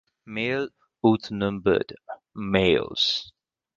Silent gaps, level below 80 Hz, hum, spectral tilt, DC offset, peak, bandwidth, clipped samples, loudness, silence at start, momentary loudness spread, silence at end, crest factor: none; -52 dBFS; none; -5.5 dB/octave; under 0.1%; -4 dBFS; 7.6 kHz; under 0.1%; -24 LUFS; 0.25 s; 14 LU; 0.5 s; 22 dB